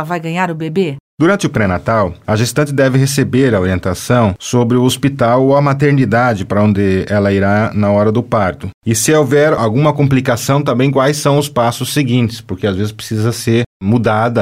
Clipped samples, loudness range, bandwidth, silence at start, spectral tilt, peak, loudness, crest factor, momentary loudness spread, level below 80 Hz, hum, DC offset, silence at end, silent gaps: under 0.1%; 2 LU; 16 kHz; 0 s; -6 dB/octave; -2 dBFS; -13 LUFS; 12 dB; 6 LU; -42 dBFS; none; 0.3%; 0 s; 1.00-1.18 s, 8.74-8.81 s, 13.66-13.80 s